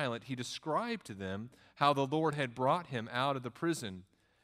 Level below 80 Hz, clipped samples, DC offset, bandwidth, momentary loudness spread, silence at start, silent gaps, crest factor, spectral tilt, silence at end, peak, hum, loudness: -76 dBFS; under 0.1%; under 0.1%; 15.5 kHz; 11 LU; 0 s; none; 22 dB; -5 dB/octave; 0.4 s; -14 dBFS; none; -35 LUFS